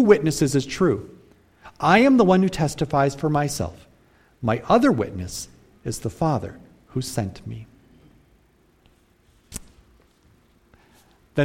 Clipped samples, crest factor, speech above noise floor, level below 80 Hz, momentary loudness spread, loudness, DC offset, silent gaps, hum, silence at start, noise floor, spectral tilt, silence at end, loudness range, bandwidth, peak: under 0.1%; 22 dB; 39 dB; -48 dBFS; 21 LU; -22 LUFS; under 0.1%; none; none; 0 s; -59 dBFS; -6 dB/octave; 0 s; 15 LU; 16.5 kHz; -2 dBFS